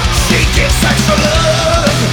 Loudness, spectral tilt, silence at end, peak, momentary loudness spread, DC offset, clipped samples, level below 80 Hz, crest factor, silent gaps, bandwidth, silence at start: -10 LUFS; -4 dB/octave; 0 s; 0 dBFS; 1 LU; under 0.1%; under 0.1%; -18 dBFS; 10 dB; none; 19.5 kHz; 0 s